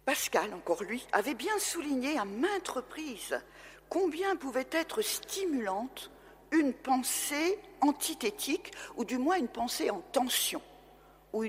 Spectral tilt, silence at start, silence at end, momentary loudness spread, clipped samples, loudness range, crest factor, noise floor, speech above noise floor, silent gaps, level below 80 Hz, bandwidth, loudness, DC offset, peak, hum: -2 dB/octave; 0.05 s; 0 s; 9 LU; under 0.1%; 2 LU; 20 dB; -58 dBFS; 25 dB; none; -66 dBFS; 16 kHz; -32 LUFS; under 0.1%; -12 dBFS; none